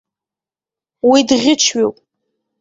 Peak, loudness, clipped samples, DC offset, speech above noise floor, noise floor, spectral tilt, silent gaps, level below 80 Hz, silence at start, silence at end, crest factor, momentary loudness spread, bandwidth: -2 dBFS; -13 LUFS; under 0.1%; under 0.1%; 77 dB; -90 dBFS; -2 dB/octave; none; -58 dBFS; 1.05 s; 0.7 s; 16 dB; 7 LU; 8 kHz